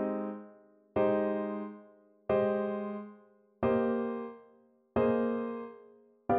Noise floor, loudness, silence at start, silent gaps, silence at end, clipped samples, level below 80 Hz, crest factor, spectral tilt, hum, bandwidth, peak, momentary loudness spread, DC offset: -64 dBFS; -33 LUFS; 0 s; none; 0 s; under 0.1%; -64 dBFS; 18 dB; -10.5 dB/octave; none; 4.5 kHz; -16 dBFS; 16 LU; under 0.1%